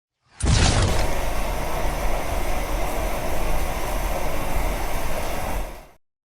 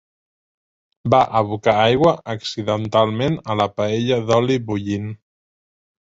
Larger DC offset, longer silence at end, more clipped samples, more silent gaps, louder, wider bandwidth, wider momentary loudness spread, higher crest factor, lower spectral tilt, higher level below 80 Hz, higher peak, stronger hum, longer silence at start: neither; second, 0.4 s vs 0.95 s; neither; neither; second, -26 LUFS vs -19 LUFS; first, 18.5 kHz vs 7.8 kHz; about the same, 9 LU vs 10 LU; about the same, 16 dB vs 18 dB; second, -4.5 dB/octave vs -6.5 dB/octave; first, -26 dBFS vs -50 dBFS; second, -6 dBFS vs -2 dBFS; neither; second, 0.4 s vs 1.05 s